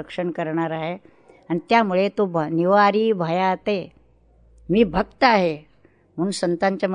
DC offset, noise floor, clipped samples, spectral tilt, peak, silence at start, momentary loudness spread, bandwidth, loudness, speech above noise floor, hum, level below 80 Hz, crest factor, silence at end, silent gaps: under 0.1%; -57 dBFS; under 0.1%; -6 dB/octave; -4 dBFS; 0 s; 12 LU; 10.5 kHz; -21 LUFS; 36 dB; none; -50 dBFS; 18 dB; 0 s; none